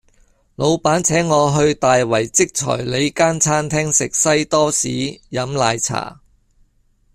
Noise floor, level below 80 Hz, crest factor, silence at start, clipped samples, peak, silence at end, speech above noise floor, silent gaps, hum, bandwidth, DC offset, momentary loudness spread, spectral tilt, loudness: -58 dBFS; -48 dBFS; 16 dB; 0.6 s; under 0.1%; -2 dBFS; 1 s; 41 dB; none; none; 15 kHz; under 0.1%; 7 LU; -3.5 dB/octave; -17 LUFS